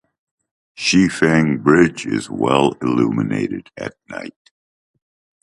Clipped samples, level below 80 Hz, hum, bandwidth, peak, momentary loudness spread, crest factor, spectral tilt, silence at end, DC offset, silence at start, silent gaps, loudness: under 0.1%; -50 dBFS; none; 11.5 kHz; 0 dBFS; 17 LU; 18 dB; -5.5 dB/octave; 1.1 s; under 0.1%; 0.8 s; none; -17 LUFS